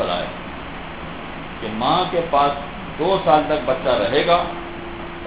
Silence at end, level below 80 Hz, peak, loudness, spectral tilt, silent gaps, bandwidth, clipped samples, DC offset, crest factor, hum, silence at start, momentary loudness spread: 0 s; -42 dBFS; 0 dBFS; -20 LUFS; -9 dB/octave; none; 4 kHz; under 0.1%; 0.8%; 20 dB; none; 0 s; 15 LU